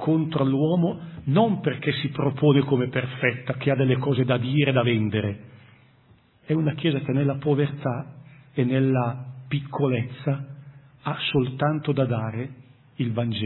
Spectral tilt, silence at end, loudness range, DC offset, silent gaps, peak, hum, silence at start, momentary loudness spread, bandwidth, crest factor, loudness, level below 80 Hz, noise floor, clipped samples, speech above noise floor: -11.5 dB/octave; 0 s; 4 LU; under 0.1%; none; -6 dBFS; none; 0 s; 11 LU; 4.2 kHz; 18 dB; -24 LUFS; -60 dBFS; -57 dBFS; under 0.1%; 34 dB